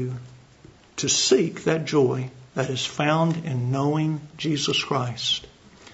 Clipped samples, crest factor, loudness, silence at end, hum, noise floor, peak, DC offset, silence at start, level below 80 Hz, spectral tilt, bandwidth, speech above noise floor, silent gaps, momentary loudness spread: under 0.1%; 18 dB; -24 LUFS; 0 s; none; -51 dBFS; -6 dBFS; under 0.1%; 0 s; -60 dBFS; -4 dB/octave; 8 kHz; 27 dB; none; 9 LU